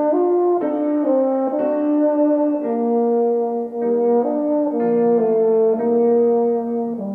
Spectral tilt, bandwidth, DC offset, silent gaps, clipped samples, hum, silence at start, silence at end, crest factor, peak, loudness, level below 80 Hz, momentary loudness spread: -11 dB/octave; 2.8 kHz; under 0.1%; none; under 0.1%; none; 0 s; 0 s; 10 dB; -8 dBFS; -18 LUFS; -68 dBFS; 4 LU